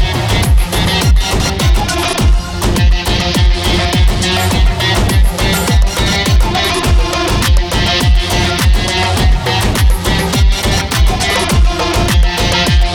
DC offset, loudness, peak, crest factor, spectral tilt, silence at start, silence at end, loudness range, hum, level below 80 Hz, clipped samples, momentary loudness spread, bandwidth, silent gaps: under 0.1%; -12 LUFS; -2 dBFS; 8 dB; -4 dB/octave; 0 s; 0 s; 1 LU; none; -14 dBFS; under 0.1%; 2 LU; 17.5 kHz; none